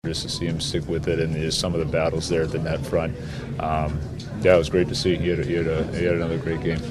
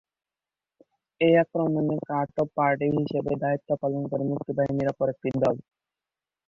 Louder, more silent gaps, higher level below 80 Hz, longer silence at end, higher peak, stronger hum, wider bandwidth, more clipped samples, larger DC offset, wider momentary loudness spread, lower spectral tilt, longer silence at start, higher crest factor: about the same, -24 LUFS vs -26 LUFS; neither; first, -38 dBFS vs -62 dBFS; second, 0 s vs 0.85 s; first, -4 dBFS vs -10 dBFS; neither; first, 13.5 kHz vs 7.2 kHz; neither; neither; about the same, 8 LU vs 7 LU; second, -5.5 dB/octave vs -9 dB/octave; second, 0.05 s vs 1.2 s; about the same, 20 dB vs 18 dB